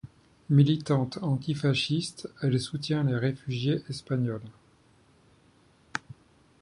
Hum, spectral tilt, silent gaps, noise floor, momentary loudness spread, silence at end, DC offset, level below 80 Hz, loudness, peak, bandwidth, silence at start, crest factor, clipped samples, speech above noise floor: none; -6.5 dB/octave; none; -61 dBFS; 14 LU; 0.65 s; under 0.1%; -62 dBFS; -28 LUFS; -8 dBFS; 11 kHz; 0.05 s; 20 dB; under 0.1%; 34 dB